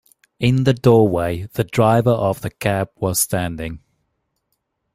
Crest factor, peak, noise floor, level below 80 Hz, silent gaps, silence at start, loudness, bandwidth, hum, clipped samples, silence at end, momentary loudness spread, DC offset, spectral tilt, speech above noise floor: 18 dB; -2 dBFS; -72 dBFS; -46 dBFS; none; 0.4 s; -18 LUFS; 16 kHz; none; under 0.1%; 1.15 s; 11 LU; under 0.1%; -6 dB/octave; 55 dB